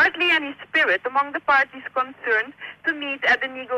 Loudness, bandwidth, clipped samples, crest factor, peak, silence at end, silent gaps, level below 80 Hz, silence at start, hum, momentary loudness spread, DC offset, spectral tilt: -21 LUFS; 14 kHz; under 0.1%; 12 dB; -10 dBFS; 0 s; none; -64 dBFS; 0 s; none; 8 LU; under 0.1%; -3 dB/octave